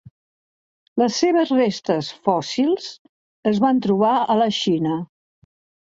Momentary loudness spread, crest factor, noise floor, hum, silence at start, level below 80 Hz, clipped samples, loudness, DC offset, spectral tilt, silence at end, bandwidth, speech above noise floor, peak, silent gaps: 8 LU; 18 dB; under -90 dBFS; none; 0.95 s; -64 dBFS; under 0.1%; -20 LUFS; under 0.1%; -5.5 dB/octave; 0.9 s; 7.8 kHz; over 71 dB; -2 dBFS; 2.99-3.43 s